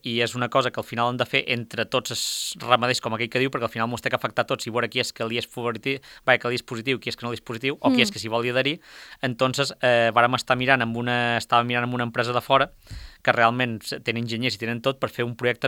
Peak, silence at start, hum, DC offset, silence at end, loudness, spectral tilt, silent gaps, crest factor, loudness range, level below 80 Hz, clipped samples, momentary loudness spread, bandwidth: 0 dBFS; 0.05 s; none; under 0.1%; 0 s; -24 LUFS; -4 dB/octave; none; 24 dB; 4 LU; -56 dBFS; under 0.1%; 8 LU; 19 kHz